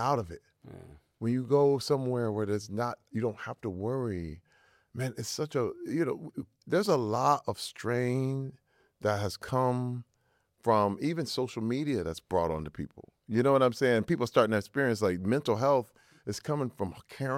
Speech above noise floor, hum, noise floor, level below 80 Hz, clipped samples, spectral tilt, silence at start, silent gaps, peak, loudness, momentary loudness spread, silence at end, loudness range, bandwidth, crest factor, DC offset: 43 dB; none; -73 dBFS; -60 dBFS; under 0.1%; -6 dB/octave; 0 s; none; -10 dBFS; -30 LUFS; 13 LU; 0 s; 6 LU; 16.5 kHz; 20 dB; under 0.1%